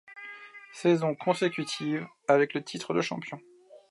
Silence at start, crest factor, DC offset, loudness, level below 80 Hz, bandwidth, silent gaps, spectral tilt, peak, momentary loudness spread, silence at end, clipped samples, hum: 0.1 s; 20 dB; under 0.1%; -28 LUFS; -78 dBFS; 11.5 kHz; none; -5.5 dB/octave; -10 dBFS; 19 LU; 0.15 s; under 0.1%; none